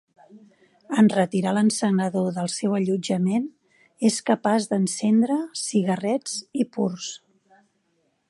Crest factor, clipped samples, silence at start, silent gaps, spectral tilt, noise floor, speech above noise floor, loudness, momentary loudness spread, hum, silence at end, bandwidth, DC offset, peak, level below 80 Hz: 18 dB; under 0.1%; 0.35 s; none; -5.5 dB/octave; -70 dBFS; 47 dB; -23 LUFS; 8 LU; none; 1.1 s; 11.5 kHz; under 0.1%; -6 dBFS; -72 dBFS